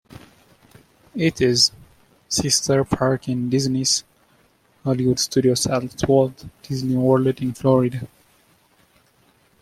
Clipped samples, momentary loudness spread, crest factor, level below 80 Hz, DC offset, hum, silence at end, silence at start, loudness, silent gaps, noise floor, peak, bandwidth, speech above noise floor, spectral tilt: under 0.1%; 9 LU; 18 dB; -50 dBFS; under 0.1%; none; 1.55 s; 1.15 s; -20 LUFS; none; -59 dBFS; -2 dBFS; 15 kHz; 39 dB; -4.5 dB/octave